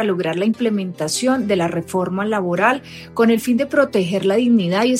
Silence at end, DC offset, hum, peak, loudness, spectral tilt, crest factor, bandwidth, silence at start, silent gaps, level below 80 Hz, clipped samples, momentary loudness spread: 0 s; under 0.1%; none; -4 dBFS; -18 LUFS; -5 dB/octave; 14 dB; 16 kHz; 0 s; none; -58 dBFS; under 0.1%; 6 LU